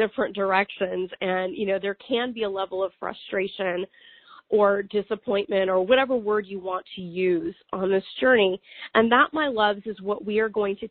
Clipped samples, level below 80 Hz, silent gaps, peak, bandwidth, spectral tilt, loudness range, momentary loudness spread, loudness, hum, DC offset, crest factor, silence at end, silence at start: under 0.1%; -62 dBFS; none; -4 dBFS; 4.5 kHz; -2.5 dB/octave; 5 LU; 11 LU; -24 LUFS; none; under 0.1%; 20 dB; 0 s; 0 s